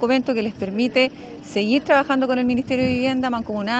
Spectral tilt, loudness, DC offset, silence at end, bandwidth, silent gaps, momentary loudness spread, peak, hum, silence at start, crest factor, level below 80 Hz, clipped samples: -5.5 dB/octave; -20 LUFS; under 0.1%; 0 s; 8.2 kHz; none; 7 LU; -4 dBFS; none; 0 s; 16 dB; -54 dBFS; under 0.1%